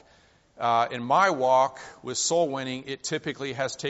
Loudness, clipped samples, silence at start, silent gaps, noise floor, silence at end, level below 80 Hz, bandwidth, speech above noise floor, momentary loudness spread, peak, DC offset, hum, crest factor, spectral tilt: -25 LUFS; under 0.1%; 0.6 s; none; -59 dBFS; 0 s; -68 dBFS; 8 kHz; 34 dB; 11 LU; -8 dBFS; under 0.1%; none; 18 dB; -2.5 dB/octave